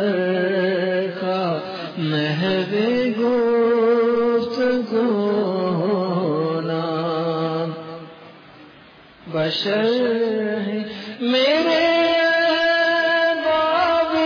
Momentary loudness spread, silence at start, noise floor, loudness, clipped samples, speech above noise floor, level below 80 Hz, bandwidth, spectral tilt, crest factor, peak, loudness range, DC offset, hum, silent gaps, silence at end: 9 LU; 0 s; -46 dBFS; -20 LUFS; under 0.1%; 27 dB; -62 dBFS; 5.4 kHz; -6.5 dB/octave; 12 dB; -8 dBFS; 6 LU; under 0.1%; none; none; 0 s